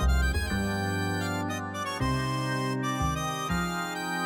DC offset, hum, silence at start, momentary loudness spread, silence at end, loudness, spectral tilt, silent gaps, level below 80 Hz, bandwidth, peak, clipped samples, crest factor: under 0.1%; none; 0 s; 3 LU; 0 s; -29 LUFS; -5 dB/octave; none; -34 dBFS; 20 kHz; -16 dBFS; under 0.1%; 12 dB